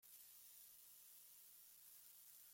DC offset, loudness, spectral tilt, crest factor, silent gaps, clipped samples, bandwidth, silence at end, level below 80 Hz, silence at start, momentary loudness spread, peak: under 0.1%; -62 LUFS; 1.5 dB/octave; 16 dB; none; under 0.1%; 16.5 kHz; 0 s; under -90 dBFS; 0 s; 1 LU; -48 dBFS